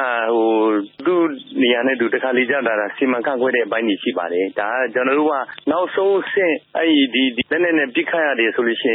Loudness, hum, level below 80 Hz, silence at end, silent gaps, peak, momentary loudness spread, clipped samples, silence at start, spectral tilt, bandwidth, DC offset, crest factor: -18 LUFS; none; -68 dBFS; 0 s; none; -4 dBFS; 4 LU; under 0.1%; 0 s; -9 dB/octave; 4 kHz; under 0.1%; 14 dB